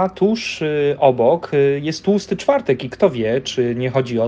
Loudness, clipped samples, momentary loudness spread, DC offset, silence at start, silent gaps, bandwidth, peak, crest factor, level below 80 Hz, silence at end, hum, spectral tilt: -18 LUFS; under 0.1%; 5 LU; under 0.1%; 0 s; none; 8.8 kHz; 0 dBFS; 18 dB; -54 dBFS; 0 s; none; -6 dB/octave